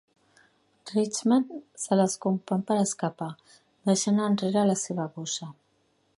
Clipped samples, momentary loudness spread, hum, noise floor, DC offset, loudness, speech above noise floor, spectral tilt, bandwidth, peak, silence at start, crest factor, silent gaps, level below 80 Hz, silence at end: under 0.1%; 12 LU; none; -69 dBFS; under 0.1%; -27 LUFS; 43 dB; -5 dB/octave; 11.5 kHz; -10 dBFS; 0.85 s; 18 dB; none; -72 dBFS; 0.65 s